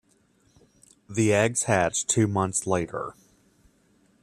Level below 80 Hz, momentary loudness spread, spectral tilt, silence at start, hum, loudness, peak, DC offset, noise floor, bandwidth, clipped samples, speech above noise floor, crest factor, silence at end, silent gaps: -60 dBFS; 12 LU; -4.5 dB/octave; 1.1 s; none; -24 LUFS; -6 dBFS; under 0.1%; -64 dBFS; 14 kHz; under 0.1%; 40 dB; 22 dB; 1.1 s; none